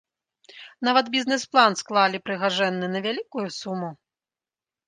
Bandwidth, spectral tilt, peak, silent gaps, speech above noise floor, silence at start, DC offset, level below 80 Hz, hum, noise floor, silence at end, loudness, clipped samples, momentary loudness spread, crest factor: 9.8 kHz; -3.5 dB/octave; -4 dBFS; none; over 67 dB; 0.55 s; under 0.1%; -76 dBFS; none; under -90 dBFS; 0.95 s; -23 LUFS; under 0.1%; 12 LU; 20 dB